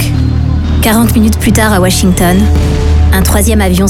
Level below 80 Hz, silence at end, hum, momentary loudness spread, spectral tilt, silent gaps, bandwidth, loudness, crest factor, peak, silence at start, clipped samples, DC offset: -12 dBFS; 0 s; none; 4 LU; -5.5 dB/octave; none; 17 kHz; -9 LUFS; 8 dB; 0 dBFS; 0 s; under 0.1%; under 0.1%